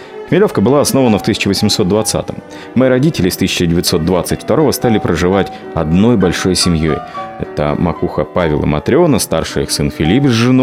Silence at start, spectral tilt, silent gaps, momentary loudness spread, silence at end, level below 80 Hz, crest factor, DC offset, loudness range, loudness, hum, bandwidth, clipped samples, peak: 0 s; -5 dB/octave; none; 7 LU; 0 s; -36 dBFS; 12 dB; under 0.1%; 2 LU; -13 LUFS; none; 16.5 kHz; under 0.1%; 0 dBFS